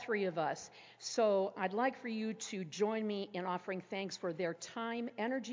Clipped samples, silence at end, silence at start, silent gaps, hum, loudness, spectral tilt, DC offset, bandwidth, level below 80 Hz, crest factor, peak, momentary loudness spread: under 0.1%; 0 s; 0 s; none; none; -38 LUFS; -4.5 dB/octave; under 0.1%; 7.6 kHz; -86 dBFS; 18 dB; -20 dBFS; 8 LU